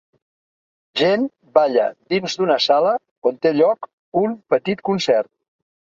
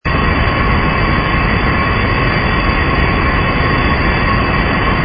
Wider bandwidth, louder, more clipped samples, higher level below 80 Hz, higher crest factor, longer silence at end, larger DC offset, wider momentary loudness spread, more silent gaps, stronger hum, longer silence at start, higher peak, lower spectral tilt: first, 7.6 kHz vs 5.4 kHz; second, -19 LUFS vs -13 LUFS; neither; second, -66 dBFS vs -20 dBFS; first, 18 dB vs 12 dB; first, 0.7 s vs 0 s; neither; first, 7 LU vs 0 LU; first, 3.11-3.22 s, 3.93-4.12 s vs none; neither; first, 0.95 s vs 0.05 s; about the same, -2 dBFS vs 0 dBFS; second, -5 dB/octave vs -9.5 dB/octave